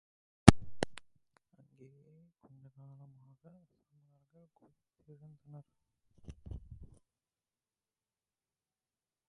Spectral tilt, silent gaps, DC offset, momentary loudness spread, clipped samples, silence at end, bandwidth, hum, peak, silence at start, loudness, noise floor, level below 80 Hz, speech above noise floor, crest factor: -6 dB/octave; none; under 0.1%; 29 LU; under 0.1%; 2.7 s; 10.5 kHz; none; 0 dBFS; 0.45 s; -28 LUFS; under -90 dBFS; -50 dBFS; over 33 dB; 36 dB